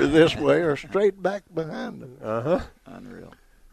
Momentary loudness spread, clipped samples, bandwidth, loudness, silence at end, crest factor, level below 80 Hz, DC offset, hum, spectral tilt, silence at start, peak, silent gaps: 24 LU; under 0.1%; 12.5 kHz; -24 LUFS; 0.45 s; 20 dB; -48 dBFS; under 0.1%; none; -6 dB/octave; 0 s; -4 dBFS; none